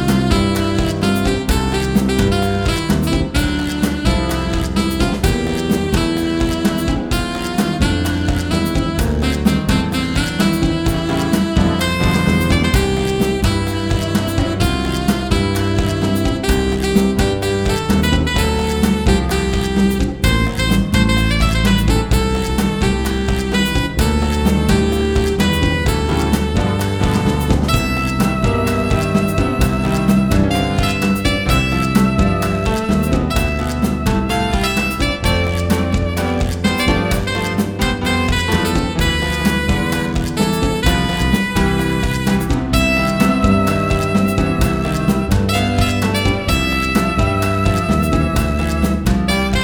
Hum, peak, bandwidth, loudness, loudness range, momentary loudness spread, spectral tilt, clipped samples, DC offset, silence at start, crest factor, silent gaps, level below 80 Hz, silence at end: none; 0 dBFS; over 20 kHz; -16 LUFS; 2 LU; 3 LU; -5.5 dB/octave; under 0.1%; 0.2%; 0 s; 16 dB; none; -22 dBFS; 0 s